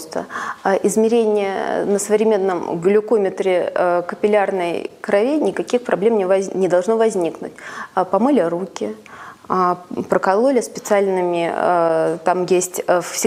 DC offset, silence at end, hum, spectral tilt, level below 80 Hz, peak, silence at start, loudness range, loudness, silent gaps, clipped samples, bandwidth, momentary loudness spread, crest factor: under 0.1%; 0 s; none; -5 dB/octave; -66 dBFS; 0 dBFS; 0 s; 2 LU; -18 LUFS; none; under 0.1%; 16 kHz; 9 LU; 18 dB